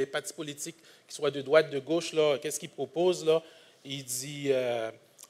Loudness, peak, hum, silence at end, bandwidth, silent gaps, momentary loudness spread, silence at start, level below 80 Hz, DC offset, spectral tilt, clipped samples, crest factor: -30 LUFS; -8 dBFS; none; 0.05 s; 16 kHz; none; 14 LU; 0 s; -84 dBFS; under 0.1%; -3.5 dB/octave; under 0.1%; 22 dB